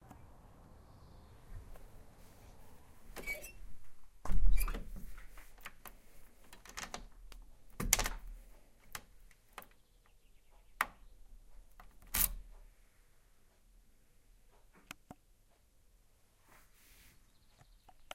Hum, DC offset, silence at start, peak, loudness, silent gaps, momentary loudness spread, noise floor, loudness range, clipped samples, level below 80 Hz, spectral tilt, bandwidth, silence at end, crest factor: none; under 0.1%; 1.5 s; -6 dBFS; -39 LUFS; none; 29 LU; -67 dBFS; 21 LU; under 0.1%; -46 dBFS; -2 dB/octave; 16 kHz; 5.75 s; 30 dB